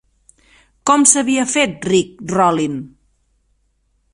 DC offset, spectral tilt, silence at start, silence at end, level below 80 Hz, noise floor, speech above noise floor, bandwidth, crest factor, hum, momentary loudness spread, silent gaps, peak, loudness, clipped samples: under 0.1%; -3 dB/octave; 0.85 s; 1.25 s; -54 dBFS; -63 dBFS; 48 dB; 12.5 kHz; 18 dB; none; 12 LU; none; 0 dBFS; -15 LUFS; under 0.1%